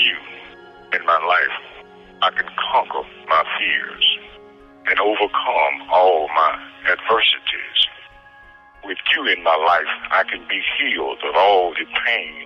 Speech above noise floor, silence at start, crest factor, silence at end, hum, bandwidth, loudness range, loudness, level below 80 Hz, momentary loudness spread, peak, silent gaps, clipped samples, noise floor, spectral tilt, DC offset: 27 dB; 0 s; 14 dB; 0 s; none; 7 kHz; 3 LU; -18 LUFS; -56 dBFS; 8 LU; -6 dBFS; none; under 0.1%; -46 dBFS; -3 dB/octave; under 0.1%